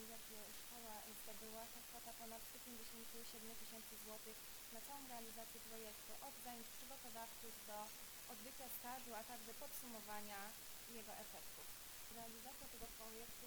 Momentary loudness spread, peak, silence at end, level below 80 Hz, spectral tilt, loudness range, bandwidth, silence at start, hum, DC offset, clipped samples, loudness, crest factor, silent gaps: 3 LU; -36 dBFS; 0 s; -72 dBFS; -1.5 dB/octave; 1 LU; over 20 kHz; 0 s; none; under 0.1%; under 0.1%; -53 LUFS; 18 dB; none